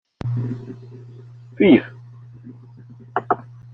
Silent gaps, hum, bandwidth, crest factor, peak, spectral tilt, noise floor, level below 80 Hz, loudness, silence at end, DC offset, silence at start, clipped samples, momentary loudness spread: none; none; 5.6 kHz; 20 dB; -2 dBFS; -9.5 dB/octave; -43 dBFS; -56 dBFS; -20 LUFS; 0.3 s; under 0.1%; 0.25 s; under 0.1%; 28 LU